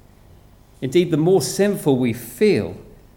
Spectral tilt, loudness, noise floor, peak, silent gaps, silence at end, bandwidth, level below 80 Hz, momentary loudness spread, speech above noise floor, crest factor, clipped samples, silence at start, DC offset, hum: -6 dB/octave; -19 LUFS; -48 dBFS; -4 dBFS; none; 0.35 s; 19 kHz; -50 dBFS; 12 LU; 30 dB; 16 dB; under 0.1%; 0.8 s; under 0.1%; none